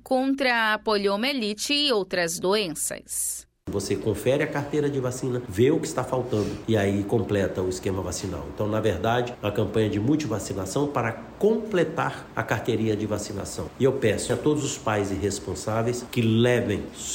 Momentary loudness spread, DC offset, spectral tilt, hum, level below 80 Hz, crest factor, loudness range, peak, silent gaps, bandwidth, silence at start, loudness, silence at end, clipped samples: 7 LU; under 0.1%; -4.5 dB/octave; none; -50 dBFS; 16 dB; 2 LU; -8 dBFS; none; 16.5 kHz; 0.05 s; -25 LUFS; 0 s; under 0.1%